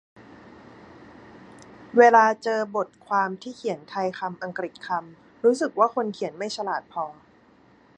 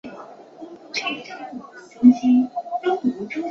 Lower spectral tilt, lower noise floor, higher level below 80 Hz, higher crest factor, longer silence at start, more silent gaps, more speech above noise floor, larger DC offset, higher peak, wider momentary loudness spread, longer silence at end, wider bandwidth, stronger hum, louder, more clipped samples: about the same, -4.5 dB/octave vs -5 dB/octave; first, -56 dBFS vs -41 dBFS; about the same, -70 dBFS vs -66 dBFS; about the same, 22 dB vs 20 dB; first, 1.8 s vs 0.05 s; neither; first, 33 dB vs 23 dB; neither; about the same, -4 dBFS vs -2 dBFS; second, 15 LU vs 25 LU; first, 0.85 s vs 0 s; first, 9.6 kHz vs 6.8 kHz; neither; second, -24 LUFS vs -21 LUFS; neither